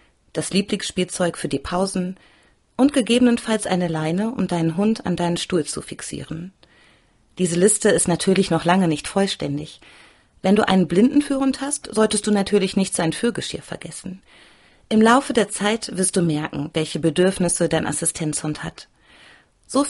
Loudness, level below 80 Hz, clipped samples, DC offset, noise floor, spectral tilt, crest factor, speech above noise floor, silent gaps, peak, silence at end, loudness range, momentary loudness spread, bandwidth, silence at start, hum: -20 LUFS; -50 dBFS; under 0.1%; under 0.1%; -57 dBFS; -4.5 dB/octave; 18 dB; 37 dB; none; -2 dBFS; 0 s; 3 LU; 14 LU; 11.5 kHz; 0.35 s; none